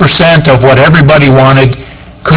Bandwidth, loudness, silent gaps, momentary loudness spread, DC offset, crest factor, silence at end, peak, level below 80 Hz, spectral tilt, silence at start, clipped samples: 4 kHz; -4 LUFS; none; 8 LU; under 0.1%; 4 dB; 0 s; 0 dBFS; -28 dBFS; -10.5 dB/octave; 0 s; 5%